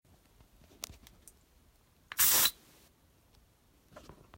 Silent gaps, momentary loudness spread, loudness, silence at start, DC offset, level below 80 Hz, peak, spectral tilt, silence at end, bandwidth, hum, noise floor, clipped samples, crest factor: none; 23 LU; -26 LUFS; 2.15 s; under 0.1%; -64 dBFS; -12 dBFS; 1 dB/octave; 1.85 s; 16.5 kHz; none; -66 dBFS; under 0.1%; 24 dB